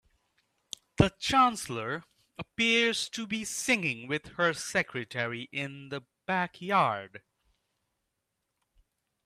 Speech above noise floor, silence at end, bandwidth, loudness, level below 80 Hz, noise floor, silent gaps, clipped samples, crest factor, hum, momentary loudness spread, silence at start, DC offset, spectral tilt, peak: 52 dB; 2.1 s; 15 kHz; -29 LUFS; -56 dBFS; -83 dBFS; none; under 0.1%; 26 dB; none; 17 LU; 1 s; under 0.1%; -3.5 dB/octave; -6 dBFS